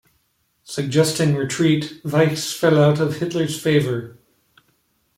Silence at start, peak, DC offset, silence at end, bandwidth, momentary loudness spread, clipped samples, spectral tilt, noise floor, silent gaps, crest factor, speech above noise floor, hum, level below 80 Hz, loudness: 0.7 s; -2 dBFS; under 0.1%; 1.05 s; 16 kHz; 10 LU; under 0.1%; -5.5 dB/octave; -66 dBFS; none; 18 dB; 48 dB; none; -58 dBFS; -19 LUFS